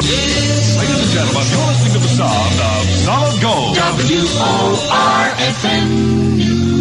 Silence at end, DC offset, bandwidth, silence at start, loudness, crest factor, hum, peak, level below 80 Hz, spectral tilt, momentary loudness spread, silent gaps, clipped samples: 0 s; under 0.1%; 11.5 kHz; 0 s; -13 LUFS; 12 dB; none; -2 dBFS; -34 dBFS; -4.5 dB/octave; 1 LU; none; under 0.1%